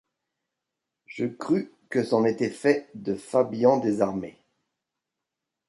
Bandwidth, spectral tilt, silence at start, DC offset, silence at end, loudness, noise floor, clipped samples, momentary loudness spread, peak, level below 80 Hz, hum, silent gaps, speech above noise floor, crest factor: 11.5 kHz; -6.5 dB/octave; 1.1 s; under 0.1%; 1.4 s; -25 LUFS; -86 dBFS; under 0.1%; 11 LU; -8 dBFS; -68 dBFS; none; none; 61 dB; 20 dB